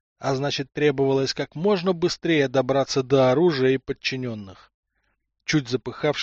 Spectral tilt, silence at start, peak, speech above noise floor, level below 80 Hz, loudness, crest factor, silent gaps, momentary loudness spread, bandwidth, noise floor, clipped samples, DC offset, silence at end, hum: -4.5 dB/octave; 0.2 s; -6 dBFS; 51 dB; -56 dBFS; -23 LUFS; 16 dB; 4.74-4.83 s; 8 LU; 8 kHz; -73 dBFS; under 0.1%; under 0.1%; 0 s; none